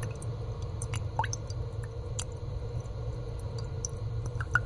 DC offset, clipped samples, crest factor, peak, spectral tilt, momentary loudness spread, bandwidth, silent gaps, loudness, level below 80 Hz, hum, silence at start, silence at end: under 0.1%; under 0.1%; 24 dB; -10 dBFS; -4.5 dB/octave; 5 LU; 11.5 kHz; none; -36 LUFS; -42 dBFS; none; 0 s; 0 s